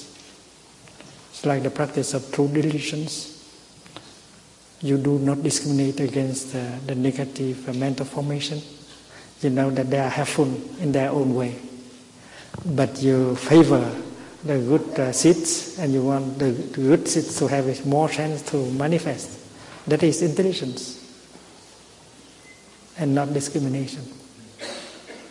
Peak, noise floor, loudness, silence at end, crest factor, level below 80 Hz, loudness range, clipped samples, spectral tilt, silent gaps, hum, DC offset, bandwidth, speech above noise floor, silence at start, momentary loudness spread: -6 dBFS; -50 dBFS; -23 LUFS; 0 s; 18 dB; -60 dBFS; 8 LU; under 0.1%; -5.5 dB/octave; none; none; under 0.1%; 11.5 kHz; 28 dB; 0 s; 21 LU